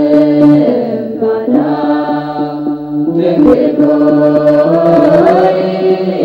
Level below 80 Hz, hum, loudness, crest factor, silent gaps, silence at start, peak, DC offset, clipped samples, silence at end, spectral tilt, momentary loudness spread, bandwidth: -46 dBFS; none; -10 LUFS; 10 dB; none; 0 s; 0 dBFS; under 0.1%; under 0.1%; 0 s; -9 dB/octave; 9 LU; 5.4 kHz